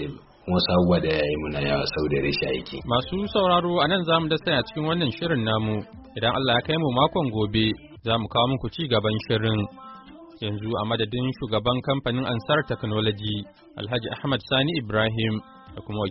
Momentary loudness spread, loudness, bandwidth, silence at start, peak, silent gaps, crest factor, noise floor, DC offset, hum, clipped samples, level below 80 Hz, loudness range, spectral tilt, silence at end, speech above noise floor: 11 LU; -24 LUFS; 5.8 kHz; 0 s; -6 dBFS; none; 18 dB; -45 dBFS; under 0.1%; none; under 0.1%; -46 dBFS; 3 LU; -4 dB/octave; 0 s; 21 dB